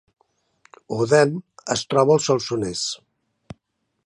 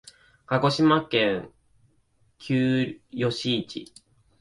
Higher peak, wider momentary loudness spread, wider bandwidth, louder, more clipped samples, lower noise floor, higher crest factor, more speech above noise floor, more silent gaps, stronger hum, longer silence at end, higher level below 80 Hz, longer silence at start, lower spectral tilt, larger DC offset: first, -2 dBFS vs -8 dBFS; about the same, 13 LU vs 13 LU; about the same, 11.5 kHz vs 11.5 kHz; first, -21 LUFS vs -24 LUFS; neither; first, -74 dBFS vs -65 dBFS; about the same, 20 dB vs 18 dB; first, 54 dB vs 41 dB; neither; neither; first, 1.1 s vs 0.55 s; about the same, -58 dBFS vs -60 dBFS; first, 0.9 s vs 0.5 s; second, -4.5 dB/octave vs -6 dB/octave; neither